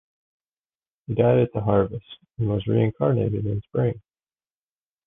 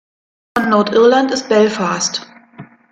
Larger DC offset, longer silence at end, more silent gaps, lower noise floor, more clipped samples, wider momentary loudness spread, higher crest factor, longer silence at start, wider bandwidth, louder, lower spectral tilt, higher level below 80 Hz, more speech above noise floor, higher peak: neither; first, 1.1 s vs 0.25 s; neither; first, under -90 dBFS vs -39 dBFS; neither; about the same, 10 LU vs 9 LU; about the same, 18 dB vs 16 dB; first, 1.1 s vs 0.55 s; second, 3.8 kHz vs 14 kHz; second, -23 LUFS vs -14 LUFS; first, -11.5 dB/octave vs -4 dB/octave; first, -48 dBFS vs -58 dBFS; first, over 68 dB vs 26 dB; second, -6 dBFS vs 0 dBFS